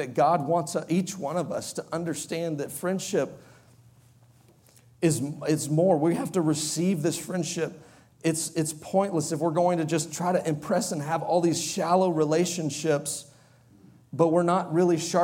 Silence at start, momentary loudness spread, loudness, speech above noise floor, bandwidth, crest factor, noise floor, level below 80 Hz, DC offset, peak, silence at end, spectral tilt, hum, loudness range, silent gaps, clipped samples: 0 s; 8 LU; -26 LUFS; 32 dB; 17 kHz; 18 dB; -57 dBFS; -70 dBFS; under 0.1%; -8 dBFS; 0 s; -5 dB/octave; none; 6 LU; none; under 0.1%